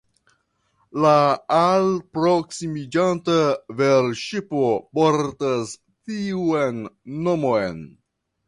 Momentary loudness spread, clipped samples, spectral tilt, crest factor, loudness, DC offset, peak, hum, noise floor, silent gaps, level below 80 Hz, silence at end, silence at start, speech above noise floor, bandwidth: 12 LU; under 0.1%; -6 dB/octave; 18 dB; -21 LUFS; under 0.1%; -4 dBFS; none; -67 dBFS; none; -58 dBFS; 0.6 s; 0.95 s; 46 dB; 11.5 kHz